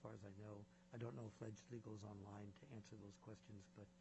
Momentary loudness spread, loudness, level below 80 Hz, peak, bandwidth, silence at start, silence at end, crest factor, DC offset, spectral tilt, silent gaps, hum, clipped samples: 8 LU; -58 LUFS; -82 dBFS; -40 dBFS; 8 kHz; 0 s; 0 s; 18 dB; under 0.1%; -7.5 dB/octave; none; none; under 0.1%